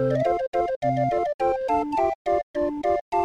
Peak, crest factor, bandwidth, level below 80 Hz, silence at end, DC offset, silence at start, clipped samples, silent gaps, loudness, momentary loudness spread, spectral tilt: -10 dBFS; 12 dB; 9.8 kHz; -50 dBFS; 0 s; under 0.1%; 0 s; under 0.1%; 0.48-0.52 s, 0.76-0.81 s, 1.34-1.39 s, 2.15-2.25 s, 2.43-2.54 s, 3.01-3.12 s; -24 LUFS; 3 LU; -8 dB/octave